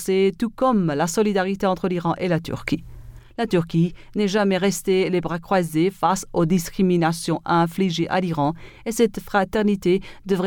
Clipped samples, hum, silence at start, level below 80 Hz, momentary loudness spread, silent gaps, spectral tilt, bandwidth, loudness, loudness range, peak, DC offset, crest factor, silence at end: under 0.1%; none; 0 s; -46 dBFS; 5 LU; none; -6 dB/octave; 18.5 kHz; -22 LUFS; 2 LU; -6 dBFS; under 0.1%; 16 dB; 0 s